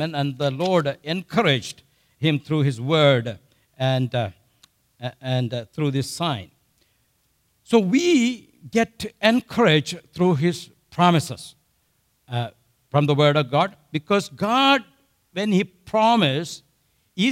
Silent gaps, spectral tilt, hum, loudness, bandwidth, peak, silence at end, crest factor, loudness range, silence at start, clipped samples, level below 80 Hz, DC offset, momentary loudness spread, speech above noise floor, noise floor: none; -5.5 dB/octave; none; -21 LUFS; 15.5 kHz; -4 dBFS; 0 s; 18 dB; 5 LU; 0 s; under 0.1%; -62 dBFS; under 0.1%; 16 LU; 46 dB; -67 dBFS